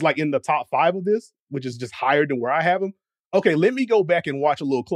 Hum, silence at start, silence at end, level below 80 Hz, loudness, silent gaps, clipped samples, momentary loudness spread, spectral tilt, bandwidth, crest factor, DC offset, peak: none; 0 s; 0 s; -72 dBFS; -21 LUFS; 1.40-1.47 s, 3.20-3.31 s; under 0.1%; 11 LU; -6.5 dB/octave; 11 kHz; 16 dB; under 0.1%; -4 dBFS